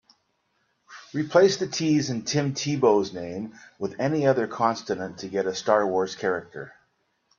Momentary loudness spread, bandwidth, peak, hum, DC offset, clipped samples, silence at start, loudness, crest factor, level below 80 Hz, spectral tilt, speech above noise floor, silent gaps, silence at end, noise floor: 13 LU; 7.4 kHz; -4 dBFS; none; under 0.1%; under 0.1%; 0.9 s; -25 LUFS; 22 dB; -68 dBFS; -5 dB/octave; 47 dB; none; 0.7 s; -72 dBFS